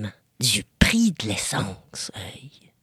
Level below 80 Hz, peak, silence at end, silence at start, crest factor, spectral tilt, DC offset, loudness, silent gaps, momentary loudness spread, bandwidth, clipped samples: -38 dBFS; 0 dBFS; 0.35 s; 0 s; 26 dB; -3.5 dB/octave; under 0.1%; -23 LUFS; none; 17 LU; 15.5 kHz; under 0.1%